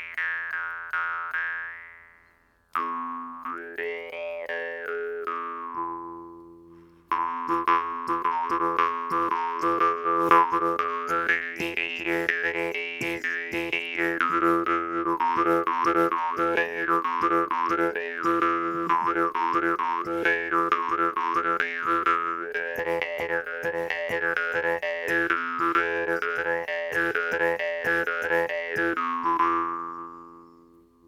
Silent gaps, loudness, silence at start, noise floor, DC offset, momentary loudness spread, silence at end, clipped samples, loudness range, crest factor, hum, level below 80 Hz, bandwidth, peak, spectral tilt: none; -26 LUFS; 0 s; -62 dBFS; under 0.1%; 9 LU; 0.6 s; under 0.1%; 8 LU; 24 dB; none; -64 dBFS; 16 kHz; -2 dBFS; -5 dB/octave